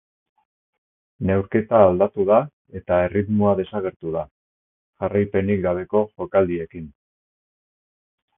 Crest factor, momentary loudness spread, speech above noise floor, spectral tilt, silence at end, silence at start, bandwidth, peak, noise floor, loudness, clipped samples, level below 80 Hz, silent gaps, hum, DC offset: 22 dB; 15 LU; over 70 dB; -12.5 dB/octave; 1.5 s; 1.2 s; 3.7 kHz; 0 dBFS; under -90 dBFS; -21 LUFS; under 0.1%; -46 dBFS; 2.53-2.65 s, 3.96-4.00 s, 4.31-4.93 s; none; under 0.1%